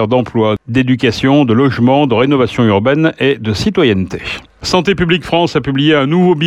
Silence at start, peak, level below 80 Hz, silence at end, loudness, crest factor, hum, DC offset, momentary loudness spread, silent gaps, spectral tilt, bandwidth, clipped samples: 0 s; 0 dBFS; -40 dBFS; 0 s; -12 LUFS; 10 dB; none; under 0.1%; 5 LU; none; -6.5 dB/octave; 12 kHz; under 0.1%